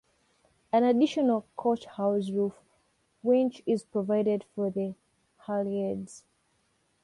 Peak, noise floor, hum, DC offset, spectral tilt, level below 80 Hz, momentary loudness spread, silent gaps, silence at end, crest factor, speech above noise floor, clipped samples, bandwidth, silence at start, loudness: -14 dBFS; -72 dBFS; none; under 0.1%; -7 dB/octave; -72 dBFS; 10 LU; none; 0.85 s; 16 dB; 44 dB; under 0.1%; 11.5 kHz; 0.75 s; -29 LUFS